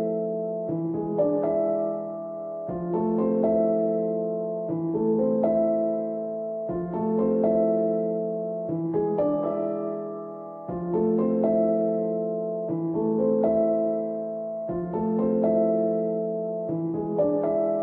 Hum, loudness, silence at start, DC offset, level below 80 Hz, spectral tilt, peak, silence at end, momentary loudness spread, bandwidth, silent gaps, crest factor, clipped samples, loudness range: none; -26 LUFS; 0 s; under 0.1%; -60 dBFS; -13 dB/octave; -12 dBFS; 0 s; 9 LU; 2.8 kHz; none; 14 dB; under 0.1%; 2 LU